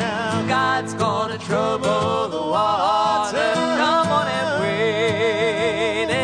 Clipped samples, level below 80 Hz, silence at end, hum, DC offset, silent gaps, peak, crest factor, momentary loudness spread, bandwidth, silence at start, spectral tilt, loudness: under 0.1%; -56 dBFS; 0 s; none; under 0.1%; none; -6 dBFS; 14 dB; 4 LU; 10.5 kHz; 0 s; -4.5 dB/octave; -20 LUFS